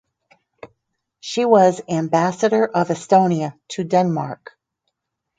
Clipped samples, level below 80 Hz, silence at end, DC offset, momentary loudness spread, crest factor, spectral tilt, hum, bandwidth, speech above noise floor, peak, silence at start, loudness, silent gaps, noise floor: under 0.1%; -68 dBFS; 1.05 s; under 0.1%; 14 LU; 20 dB; -6 dB/octave; none; 9.4 kHz; 60 dB; 0 dBFS; 0.65 s; -18 LUFS; none; -78 dBFS